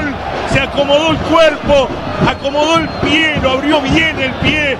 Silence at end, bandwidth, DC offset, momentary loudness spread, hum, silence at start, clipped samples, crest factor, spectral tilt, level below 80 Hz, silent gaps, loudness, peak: 0 s; 12.5 kHz; under 0.1%; 5 LU; none; 0 s; under 0.1%; 12 dB; -5 dB/octave; -30 dBFS; none; -12 LUFS; 0 dBFS